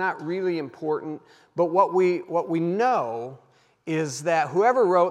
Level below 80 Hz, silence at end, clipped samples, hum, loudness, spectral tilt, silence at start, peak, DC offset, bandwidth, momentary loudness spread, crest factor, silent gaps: -84 dBFS; 0 s; under 0.1%; none; -24 LUFS; -6 dB/octave; 0 s; -6 dBFS; under 0.1%; 11.5 kHz; 15 LU; 18 dB; none